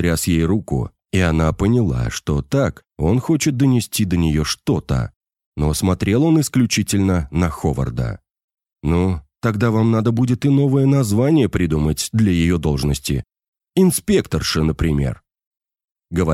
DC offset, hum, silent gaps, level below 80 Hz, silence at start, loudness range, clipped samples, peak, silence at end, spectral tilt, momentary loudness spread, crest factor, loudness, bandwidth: under 0.1%; none; 5.16-5.21 s, 5.46-5.52 s, 8.44-8.48 s, 13.48-13.52 s, 15.47-15.51 s, 15.91-15.95 s; -32 dBFS; 0 s; 3 LU; under 0.1%; -4 dBFS; 0 s; -6 dB/octave; 8 LU; 14 dB; -18 LUFS; 16 kHz